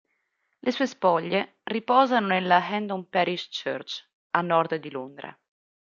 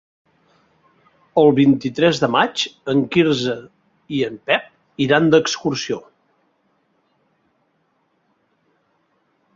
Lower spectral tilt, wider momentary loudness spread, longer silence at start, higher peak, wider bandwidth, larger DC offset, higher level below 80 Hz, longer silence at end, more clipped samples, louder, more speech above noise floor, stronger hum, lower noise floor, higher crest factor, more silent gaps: about the same, -5.5 dB/octave vs -5 dB/octave; first, 15 LU vs 12 LU; second, 0.65 s vs 1.35 s; about the same, -4 dBFS vs -2 dBFS; about the same, 7.4 kHz vs 7.8 kHz; neither; second, -76 dBFS vs -60 dBFS; second, 0.6 s vs 3.55 s; neither; second, -25 LUFS vs -18 LUFS; about the same, 50 dB vs 49 dB; neither; first, -75 dBFS vs -66 dBFS; about the same, 22 dB vs 20 dB; first, 4.13-4.30 s vs none